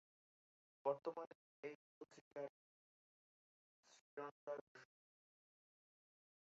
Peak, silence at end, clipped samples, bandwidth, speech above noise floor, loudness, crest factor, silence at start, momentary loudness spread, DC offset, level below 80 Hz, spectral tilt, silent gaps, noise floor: -28 dBFS; 1.75 s; under 0.1%; 7.4 kHz; over 38 dB; -51 LUFS; 26 dB; 0.85 s; 18 LU; under 0.1%; under -90 dBFS; -4.5 dB/octave; 1.27-1.63 s, 1.75-2.01 s, 2.21-2.31 s, 2.49-3.83 s, 4.01-4.17 s, 4.31-4.47 s, 4.61-4.75 s; under -90 dBFS